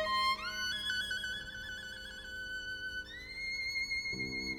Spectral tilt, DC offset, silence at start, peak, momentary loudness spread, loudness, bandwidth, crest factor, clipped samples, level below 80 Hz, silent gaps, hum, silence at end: -1.5 dB/octave; under 0.1%; 0 s; -24 dBFS; 10 LU; -37 LUFS; 17 kHz; 14 dB; under 0.1%; -58 dBFS; none; none; 0 s